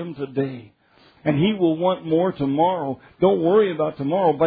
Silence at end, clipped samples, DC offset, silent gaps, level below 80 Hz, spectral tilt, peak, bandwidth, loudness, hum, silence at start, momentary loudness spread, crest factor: 0 s; under 0.1%; under 0.1%; none; -56 dBFS; -11 dB/octave; -6 dBFS; 4.9 kHz; -21 LUFS; none; 0 s; 10 LU; 16 dB